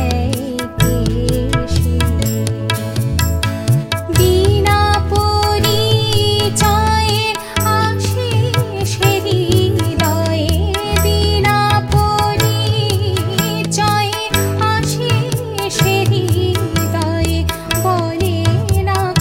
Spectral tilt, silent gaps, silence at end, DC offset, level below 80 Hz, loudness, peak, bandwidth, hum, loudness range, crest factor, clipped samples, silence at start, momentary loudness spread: -5 dB/octave; none; 0 s; under 0.1%; -26 dBFS; -15 LUFS; 0 dBFS; 16.5 kHz; none; 2 LU; 14 dB; under 0.1%; 0 s; 5 LU